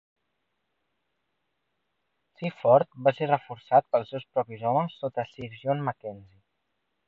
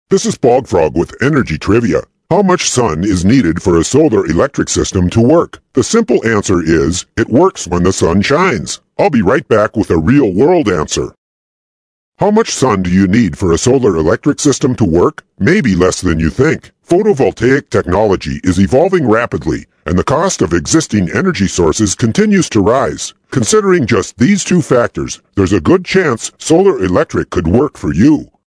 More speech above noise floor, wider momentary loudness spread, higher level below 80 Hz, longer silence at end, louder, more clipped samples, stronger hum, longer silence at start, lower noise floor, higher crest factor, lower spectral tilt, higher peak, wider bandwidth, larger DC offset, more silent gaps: second, 53 dB vs over 79 dB; first, 14 LU vs 6 LU; second, -72 dBFS vs -32 dBFS; first, 0.85 s vs 0.2 s; second, -27 LUFS vs -12 LUFS; second, under 0.1% vs 0.5%; neither; first, 2.4 s vs 0.1 s; second, -79 dBFS vs under -90 dBFS; first, 22 dB vs 12 dB; first, -9 dB/octave vs -5.5 dB/octave; second, -8 dBFS vs 0 dBFS; second, 5.2 kHz vs 11 kHz; neither; second, none vs 11.18-12.12 s